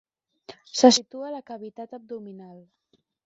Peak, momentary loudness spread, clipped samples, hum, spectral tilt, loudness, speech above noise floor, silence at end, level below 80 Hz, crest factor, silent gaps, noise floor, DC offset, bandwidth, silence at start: -2 dBFS; 23 LU; under 0.1%; none; -2.5 dB/octave; -21 LUFS; 25 dB; 0.7 s; -74 dBFS; 24 dB; none; -49 dBFS; under 0.1%; 8 kHz; 0.5 s